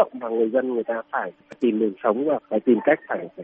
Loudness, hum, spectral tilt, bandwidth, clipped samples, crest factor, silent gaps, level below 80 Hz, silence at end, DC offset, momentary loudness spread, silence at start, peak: -23 LUFS; none; -5 dB/octave; 3.7 kHz; under 0.1%; 18 dB; none; -72 dBFS; 0 s; under 0.1%; 9 LU; 0 s; -4 dBFS